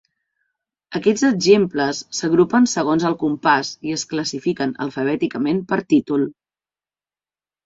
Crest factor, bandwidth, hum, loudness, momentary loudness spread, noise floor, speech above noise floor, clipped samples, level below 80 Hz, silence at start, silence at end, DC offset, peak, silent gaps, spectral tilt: 18 dB; 8 kHz; none; -19 LUFS; 9 LU; under -90 dBFS; over 72 dB; under 0.1%; -60 dBFS; 0.9 s; 1.35 s; under 0.1%; -2 dBFS; none; -4.5 dB/octave